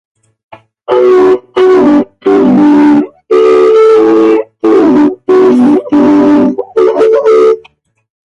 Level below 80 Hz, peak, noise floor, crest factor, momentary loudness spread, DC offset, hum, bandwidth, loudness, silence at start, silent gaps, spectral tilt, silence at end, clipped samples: -48 dBFS; 0 dBFS; -45 dBFS; 6 dB; 5 LU; under 0.1%; none; 8 kHz; -7 LUFS; 0.5 s; none; -7 dB/octave; 0.7 s; under 0.1%